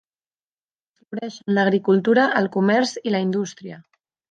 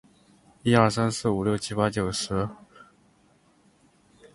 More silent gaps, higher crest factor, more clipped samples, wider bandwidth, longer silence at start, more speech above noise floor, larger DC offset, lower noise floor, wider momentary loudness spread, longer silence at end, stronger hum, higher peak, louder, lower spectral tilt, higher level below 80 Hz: neither; second, 18 dB vs 24 dB; neither; second, 9 kHz vs 11.5 kHz; first, 1.1 s vs 0.65 s; first, over 70 dB vs 37 dB; neither; first, under -90 dBFS vs -62 dBFS; first, 15 LU vs 9 LU; second, 0.5 s vs 1.5 s; neither; about the same, -4 dBFS vs -4 dBFS; first, -20 LUFS vs -25 LUFS; about the same, -6 dB/octave vs -5.5 dB/octave; second, -72 dBFS vs -52 dBFS